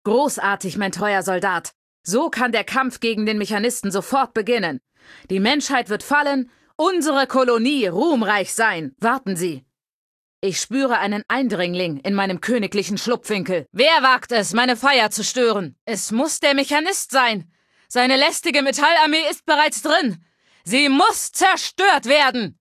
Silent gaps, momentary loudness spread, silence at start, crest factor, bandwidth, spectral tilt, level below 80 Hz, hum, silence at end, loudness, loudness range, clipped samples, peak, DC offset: 1.75-2.04 s, 9.89-10.42 s, 15.81-15.87 s; 9 LU; 0.05 s; 18 dB; 15 kHz; -3 dB/octave; -64 dBFS; none; 0.1 s; -19 LUFS; 4 LU; under 0.1%; -2 dBFS; under 0.1%